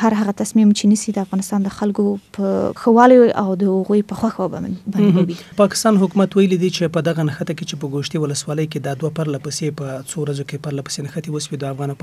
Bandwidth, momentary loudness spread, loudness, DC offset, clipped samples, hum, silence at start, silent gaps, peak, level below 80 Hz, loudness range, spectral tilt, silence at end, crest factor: 14 kHz; 11 LU; -18 LUFS; under 0.1%; under 0.1%; none; 0 s; none; 0 dBFS; -56 dBFS; 8 LU; -6 dB/octave; 0.1 s; 18 dB